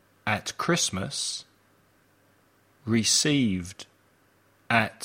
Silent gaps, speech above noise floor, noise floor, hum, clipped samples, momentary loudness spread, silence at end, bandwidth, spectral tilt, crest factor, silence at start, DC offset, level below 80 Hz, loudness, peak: none; 37 dB; -63 dBFS; none; under 0.1%; 20 LU; 0 s; 16.5 kHz; -3 dB/octave; 22 dB; 0.25 s; under 0.1%; -62 dBFS; -25 LUFS; -8 dBFS